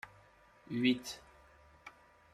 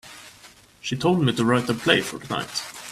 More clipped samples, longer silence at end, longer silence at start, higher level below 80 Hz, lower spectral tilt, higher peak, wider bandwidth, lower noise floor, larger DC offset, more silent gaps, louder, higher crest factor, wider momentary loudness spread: neither; first, 0.45 s vs 0 s; about the same, 0.05 s vs 0.05 s; second, -70 dBFS vs -58 dBFS; about the same, -4.5 dB/octave vs -4.5 dB/octave; second, -20 dBFS vs -2 dBFS; about the same, 14 kHz vs 15 kHz; first, -64 dBFS vs -50 dBFS; neither; neither; second, -35 LUFS vs -23 LUFS; about the same, 22 dB vs 22 dB; first, 23 LU vs 13 LU